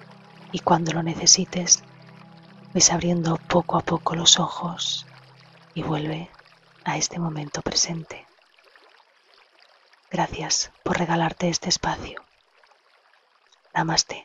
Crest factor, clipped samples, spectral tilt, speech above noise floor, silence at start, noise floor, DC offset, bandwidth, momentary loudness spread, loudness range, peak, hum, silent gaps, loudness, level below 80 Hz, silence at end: 24 dB; under 0.1%; -2.5 dB/octave; 37 dB; 0 s; -61 dBFS; under 0.1%; 8.2 kHz; 17 LU; 9 LU; 0 dBFS; none; none; -22 LUFS; -52 dBFS; 0 s